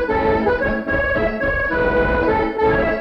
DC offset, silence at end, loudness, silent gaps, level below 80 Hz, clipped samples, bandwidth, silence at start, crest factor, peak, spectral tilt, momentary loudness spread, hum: under 0.1%; 0 s; -18 LUFS; none; -30 dBFS; under 0.1%; 6.4 kHz; 0 s; 12 dB; -6 dBFS; -8 dB/octave; 2 LU; none